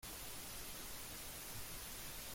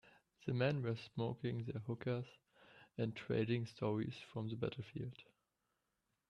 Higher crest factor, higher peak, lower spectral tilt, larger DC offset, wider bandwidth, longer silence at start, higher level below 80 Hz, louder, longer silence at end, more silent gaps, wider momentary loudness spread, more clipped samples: about the same, 14 dB vs 18 dB; second, -36 dBFS vs -24 dBFS; second, -1.5 dB/octave vs -8 dB/octave; neither; first, 16.5 kHz vs 7.4 kHz; second, 0 s vs 0.4 s; first, -60 dBFS vs -74 dBFS; second, -48 LUFS vs -42 LUFS; second, 0 s vs 1.05 s; neither; second, 0 LU vs 11 LU; neither